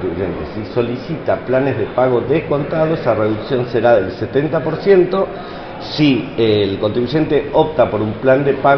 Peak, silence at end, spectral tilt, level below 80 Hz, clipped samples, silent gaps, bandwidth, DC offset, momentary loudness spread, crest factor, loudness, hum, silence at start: 0 dBFS; 0 s; -8.5 dB/octave; -42 dBFS; under 0.1%; none; 6.2 kHz; under 0.1%; 9 LU; 16 dB; -16 LUFS; none; 0 s